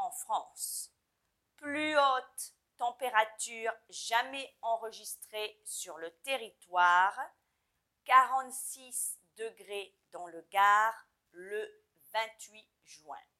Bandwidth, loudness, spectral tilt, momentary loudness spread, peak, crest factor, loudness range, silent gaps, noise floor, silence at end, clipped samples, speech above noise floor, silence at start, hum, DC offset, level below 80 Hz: 15.5 kHz; -32 LUFS; 0 dB/octave; 21 LU; -10 dBFS; 24 dB; 4 LU; none; -82 dBFS; 0.2 s; under 0.1%; 48 dB; 0 s; none; under 0.1%; -88 dBFS